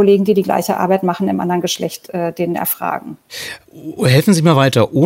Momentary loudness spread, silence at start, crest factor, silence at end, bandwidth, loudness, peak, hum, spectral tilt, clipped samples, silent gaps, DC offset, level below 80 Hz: 16 LU; 0 s; 14 dB; 0 s; 16 kHz; -15 LUFS; 0 dBFS; none; -6 dB/octave; under 0.1%; none; under 0.1%; -56 dBFS